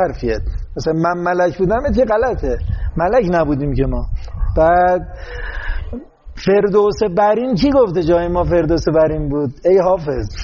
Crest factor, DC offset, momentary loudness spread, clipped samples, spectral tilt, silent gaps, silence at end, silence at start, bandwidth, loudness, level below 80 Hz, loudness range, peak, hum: 12 dB; under 0.1%; 13 LU; under 0.1%; -6.5 dB/octave; none; 0 s; 0 s; 7.2 kHz; -16 LUFS; -26 dBFS; 3 LU; -2 dBFS; none